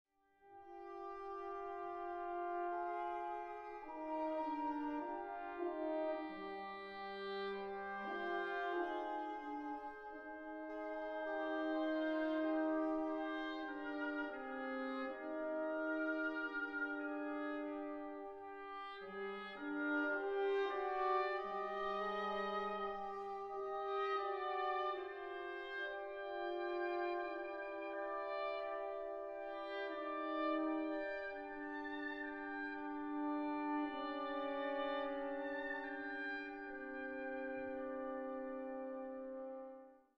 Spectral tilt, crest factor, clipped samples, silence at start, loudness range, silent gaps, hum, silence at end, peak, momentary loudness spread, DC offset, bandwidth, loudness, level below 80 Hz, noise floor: -6 dB/octave; 16 dB; under 0.1%; 0.45 s; 4 LU; none; none; 0.2 s; -26 dBFS; 9 LU; under 0.1%; 6.6 kHz; -43 LUFS; -74 dBFS; -68 dBFS